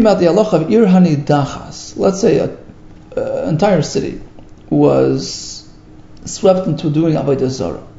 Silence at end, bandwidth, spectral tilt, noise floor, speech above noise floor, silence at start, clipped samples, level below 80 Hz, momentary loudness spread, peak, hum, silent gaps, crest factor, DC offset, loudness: 0 s; 8 kHz; -6.5 dB/octave; -38 dBFS; 25 dB; 0 s; under 0.1%; -42 dBFS; 16 LU; 0 dBFS; none; none; 14 dB; under 0.1%; -14 LUFS